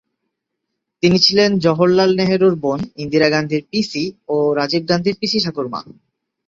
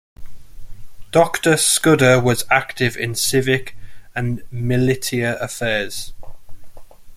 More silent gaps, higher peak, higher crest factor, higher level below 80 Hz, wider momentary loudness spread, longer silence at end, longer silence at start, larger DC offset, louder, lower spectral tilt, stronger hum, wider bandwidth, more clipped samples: neither; about the same, 0 dBFS vs -2 dBFS; about the same, 16 dB vs 18 dB; second, -54 dBFS vs -42 dBFS; about the same, 10 LU vs 12 LU; first, 0.55 s vs 0 s; first, 1.05 s vs 0.2 s; neither; about the same, -16 LUFS vs -18 LUFS; first, -5.5 dB/octave vs -4 dB/octave; neither; second, 7.6 kHz vs 16 kHz; neither